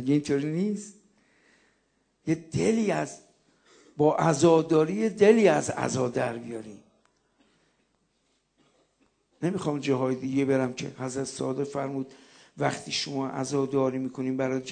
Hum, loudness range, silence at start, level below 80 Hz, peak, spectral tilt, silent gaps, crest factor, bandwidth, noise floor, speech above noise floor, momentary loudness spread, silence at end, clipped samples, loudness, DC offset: none; 11 LU; 0 s; -66 dBFS; -6 dBFS; -5.5 dB/octave; none; 22 dB; 9.4 kHz; -72 dBFS; 47 dB; 16 LU; 0 s; under 0.1%; -27 LUFS; under 0.1%